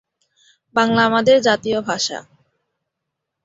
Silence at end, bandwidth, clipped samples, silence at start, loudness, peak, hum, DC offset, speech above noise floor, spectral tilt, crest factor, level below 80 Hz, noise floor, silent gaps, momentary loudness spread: 1.25 s; 7.8 kHz; under 0.1%; 0.75 s; -17 LUFS; -2 dBFS; none; under 0.1%; 63 dB; -3.5 dB/octave; 18 dB; -58 dBFS; -80 dBFS; none; 9 LU